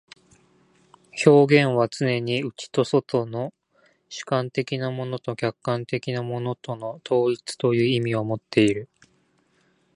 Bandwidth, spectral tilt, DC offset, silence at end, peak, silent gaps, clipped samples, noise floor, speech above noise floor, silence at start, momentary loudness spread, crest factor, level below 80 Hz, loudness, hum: 11 kHz; -6 dB/octave; under 0.1%; 1.1 s; -2 dBFS; none; under 0.1%; -65 dBFS; 42 dB; 1.15 s; 14 LU; 22 dB; -64 dBFS; -23 LUFS; none